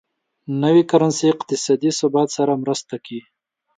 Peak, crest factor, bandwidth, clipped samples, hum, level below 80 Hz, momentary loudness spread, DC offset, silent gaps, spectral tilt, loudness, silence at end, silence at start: -2 dBFS; 18 dB; 9.4 kHz; under 0.1%; none; -68 dBFS; 16 LU; under 0.1%; none; -5.5 dB/octave; -18 LUFS; 0.6 s; 0.5 s